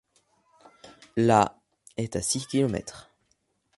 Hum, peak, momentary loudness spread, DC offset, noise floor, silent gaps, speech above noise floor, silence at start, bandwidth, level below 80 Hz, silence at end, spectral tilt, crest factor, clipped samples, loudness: none; -4 dBFS; 14 LU; under 0.1%; -72 dBFS; none; 47 dB; 0.85 s; 11.5 kHz; -56 dBFS; 0.75 s; -5 dB/octave; 24 dB; under 0.1%; -26 LUFS